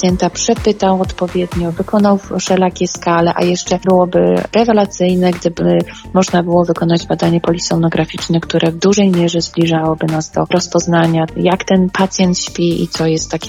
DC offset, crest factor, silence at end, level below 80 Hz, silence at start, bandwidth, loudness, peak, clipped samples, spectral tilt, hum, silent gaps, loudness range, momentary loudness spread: under 0.1%; 12 dB; 0 s; -38 dBFS; 0 s; 12 kHz; -14 LUFS; -2 dBFS; under 0.1%; -5.5 dB/octave; none; none; 1 LU; 5 LU